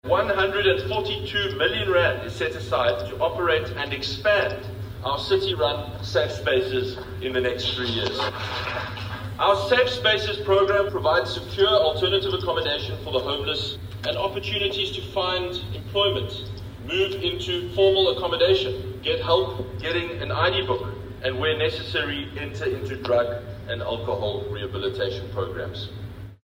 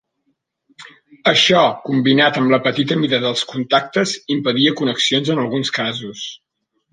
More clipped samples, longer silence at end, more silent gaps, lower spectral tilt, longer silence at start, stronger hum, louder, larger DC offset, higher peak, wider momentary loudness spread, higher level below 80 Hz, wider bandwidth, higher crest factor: neither; second, 0.1 s vs 0.55 s; neither; about the same, -5.5 dB/octave vs -4.5 dB/octave; second, 0.05 s vs 0.8 s; neither; second, -24 LUFS vs -16 LUFS; neither; second, -6 dBFS vs -2 dBFS; about the same, 10 LU vs 8 LU; first, -46 dBFS vs -62 dBFS; first, 16 kHz vs 9.8 kHz; about the same, 18 dB vs 16 dB